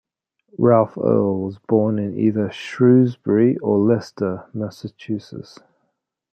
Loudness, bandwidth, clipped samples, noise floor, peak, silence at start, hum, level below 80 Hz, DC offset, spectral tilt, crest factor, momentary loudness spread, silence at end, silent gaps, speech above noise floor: -19 LUFS; 8.4 kHz; under 0.1%; -73 dBFS; -2 dBFS; 0.6 s; none; -62 dBFS; under 0.1%; -9 dB/octave; 16 dB; 14 LU; 0.9 s; none; 54 dB